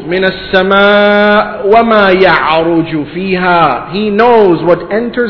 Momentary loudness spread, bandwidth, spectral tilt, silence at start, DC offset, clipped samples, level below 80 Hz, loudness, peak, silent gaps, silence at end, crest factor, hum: 8 LU; 5.4 kHz; -8 dB/octave; 0 s; under 0.1%; 2%; -40 dBFS; -8 LUFS; 0 dBFS; none; 0 s; 8 dB; none